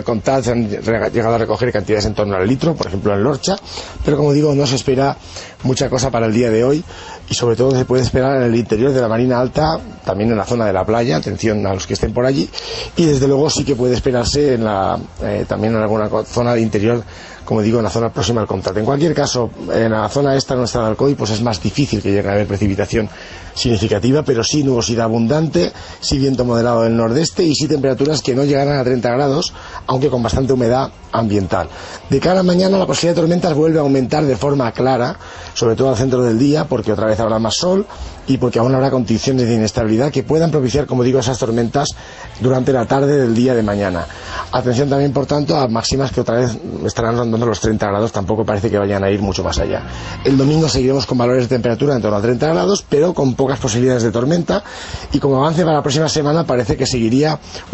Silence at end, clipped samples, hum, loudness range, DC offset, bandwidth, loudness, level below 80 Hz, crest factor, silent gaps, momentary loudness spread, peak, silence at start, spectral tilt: 0 s; under 0.1%; none; 2 LU; under 0.1%; 8.4 kHz; -16 LUFS; -36 dBFS; 14 dB; none; 6 LU; -2 dBFS; 0 s; -6 dB/octave